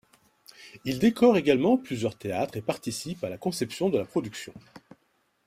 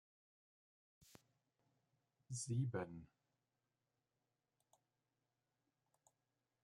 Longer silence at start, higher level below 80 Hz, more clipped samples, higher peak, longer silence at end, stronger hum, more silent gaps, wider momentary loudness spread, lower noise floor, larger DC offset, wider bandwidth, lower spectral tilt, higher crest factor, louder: second, 0.6 s vs 2.3 s; first, -64 dBFS vs -84 dBFS; neither; first, -8 dBFS vs -30 dBFS; second, 0.7 s vs 3.6 s; neither; neither; first, 16 LU vs 11 LU; second, -71 dBFS vs under -90 dBFS; neither; first, 16 kHz vs 12.5 kHz; about the same, -5.5 dB/octave vs -5.5 dB/octave; second, 18 dB vs 24 dB; first, -27 LUFS vs -46 LUFS